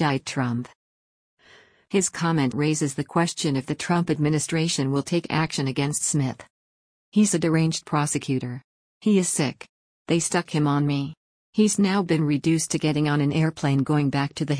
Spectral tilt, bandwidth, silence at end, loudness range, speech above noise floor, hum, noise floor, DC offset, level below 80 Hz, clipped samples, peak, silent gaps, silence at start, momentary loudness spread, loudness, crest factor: -5 dB/octave; 10.5 kHz; 0 s; 2 LU; 32 dB; none; -55 dBFS; under 0.1%; -60 dBFS; under 0.1%; -10 dBFS; 0.75-1.37 s, 6.50-7.12 s, 8.64-9.01 s, 9.69-10.05 s, 11.17-11.53 s; 0 s; 7 LU; -23 LUFS; 14 dB